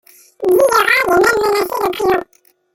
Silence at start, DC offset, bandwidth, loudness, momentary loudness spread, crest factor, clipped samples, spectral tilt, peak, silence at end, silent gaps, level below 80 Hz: 0.4 s; under 0.1%; 17 kHz; -14 LUFS; 7 LU; 14 dB; under 0.1%; -3 dB/octave; 0 dBFS; 0.5 s; none; -48 dBFS